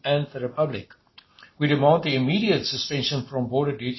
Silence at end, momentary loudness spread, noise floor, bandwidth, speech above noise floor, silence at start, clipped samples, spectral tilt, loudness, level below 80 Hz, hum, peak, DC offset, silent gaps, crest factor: 0 s; 8 LU; -52 dBFS; 6.2 kHz; 29 dB; 0.05 s; under 0.1%; -6 dB/octave; -23 LUFS; -58 dBFS; none; -6 dBFS; under 0.1%; none; 20 dB